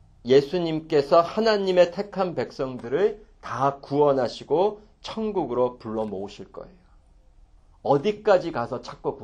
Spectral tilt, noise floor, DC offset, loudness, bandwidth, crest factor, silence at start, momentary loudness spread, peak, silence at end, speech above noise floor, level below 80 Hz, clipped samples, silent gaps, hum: -6.5 dB/octave; -55 dBFS; under 0.1%; -24 LUFS; 8.4 kHz; 18 dB; 0.25 s; 15 LU; -6 dBFS; 0 s; 31 dB; -54 dBFS; under 0.1%; none; none